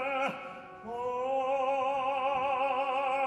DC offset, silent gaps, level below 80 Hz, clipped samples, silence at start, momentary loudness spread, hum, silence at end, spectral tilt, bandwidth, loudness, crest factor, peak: under 0.1%; none; -70 dBFS; under 0.1%; 0 s; 12 LU; none; 0 s; -4.5 dB/octave; 11 kHz; -31 LUFS; 12 dB; -20 dBFS